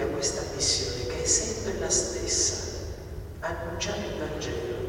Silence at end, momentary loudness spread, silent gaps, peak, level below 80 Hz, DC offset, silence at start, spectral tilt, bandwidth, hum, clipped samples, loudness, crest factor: 0 s; 11 LU; none; -12 dBFS; -42 dBFS; under 0.1%; 0 s; -2.5 dB/octave; 18 kHz; none; under 0.1%; -27 LUFS; 18 dB